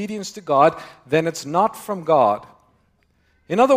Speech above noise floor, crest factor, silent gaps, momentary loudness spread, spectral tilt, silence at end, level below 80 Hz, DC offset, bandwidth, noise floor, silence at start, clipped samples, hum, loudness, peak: 43 dB; 18 dB; none; 12 LU; -5.5 dB/octave; 0 s; -64 dBFS; under 0.1%; 16 kHz; -62 dBFS; 0 s; under 0.1%; none; -20 LUFS; -2 dBFS